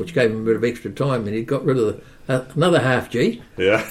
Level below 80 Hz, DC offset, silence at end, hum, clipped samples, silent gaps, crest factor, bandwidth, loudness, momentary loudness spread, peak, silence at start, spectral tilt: -50 dBFS; under 0.1%; 0 s; none; under 0.1%; none; 16 dB; 14.5 kHz; -20 LUFS; 7 LU; -4 dBFS; 0 s; -6.5 dB/octave